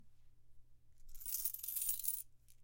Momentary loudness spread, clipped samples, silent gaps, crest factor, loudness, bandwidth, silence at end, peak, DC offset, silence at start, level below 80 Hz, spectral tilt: 11 LU; under 0.1%; none; 28 dB; -39 LUFS; 17 kHz; 0 s; -18 dBFS; under 0.1%; 0 s; -62 dBFS; 2 dB/octave